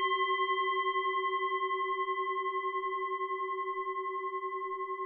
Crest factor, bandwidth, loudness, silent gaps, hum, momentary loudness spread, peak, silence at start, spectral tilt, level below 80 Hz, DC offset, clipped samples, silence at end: 12 dB; 3.4 kHz; -33 LUFS; none; none; 6 LU; -20 dBFS; 0 s; -3.5 dB/octave; -86 dBFS; under 0.1%; under 0.1%; 0 s